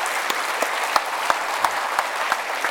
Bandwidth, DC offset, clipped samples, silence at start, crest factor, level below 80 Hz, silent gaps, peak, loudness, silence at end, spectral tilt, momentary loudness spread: 17.5 kHz; under 0.1%; under 0.1%; 0 s; 24 dB; -66 dBFS; none; 0 dBFS; -22 LUFS; 0 s; 0.5 dB/octave; 2 LU